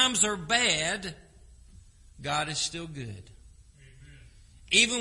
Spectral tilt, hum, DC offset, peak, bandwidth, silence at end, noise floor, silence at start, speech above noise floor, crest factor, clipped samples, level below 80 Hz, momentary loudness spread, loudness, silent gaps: -1.5 dB/octave; none; under 0.1%; -6 dBFS; 11.5 kHz; 0 s; -54 dBFS; 0 s; 25 dB; 24 dB; under 0.1%; -54 dBFS; 18 LU; -26 LUFS; none